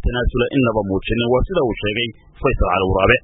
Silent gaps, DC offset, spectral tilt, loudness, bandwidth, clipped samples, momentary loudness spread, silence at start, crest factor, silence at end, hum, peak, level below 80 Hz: none; under 0.1%; -11.5 dB/octave; -19 LUFS; 3.9 kHz; under 0.1%; 5 LU; 0 s; 18 dB; 0.05 s; none; 0 dBFS; -26 dBFS